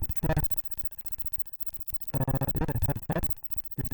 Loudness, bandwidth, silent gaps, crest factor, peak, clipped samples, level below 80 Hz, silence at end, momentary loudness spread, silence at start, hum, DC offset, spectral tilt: -29 LUFS; over 20 kHz; none; 16 dB; -14 dBFS; under 0.1%; -40 dBFS; 0 s; 4 LU; 0 s; none; under 0.1%; -7.5 dB/octave